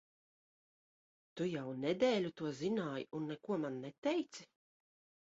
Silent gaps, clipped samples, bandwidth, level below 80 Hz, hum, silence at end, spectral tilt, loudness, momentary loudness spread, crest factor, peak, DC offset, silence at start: 3.98-4.02 s; under 0.1%; 7.6 kHz; -80 dBFS; none; 0.85 s; -5 dB/octave; -39 LUFS; 9 LU; 20 dB; -22 dBFS; under 0.1%; 1.35 s